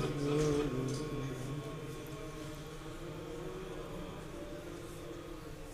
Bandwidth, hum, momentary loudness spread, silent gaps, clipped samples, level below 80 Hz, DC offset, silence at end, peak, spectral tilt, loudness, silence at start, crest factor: 15.5 kHz; none; 13 LU; none; under 0.1%; -52 dBFS; under 0.1%; 0 s; -22 dBFS; -6 dB/octave; -40 LUFS; 0 s; 18 dB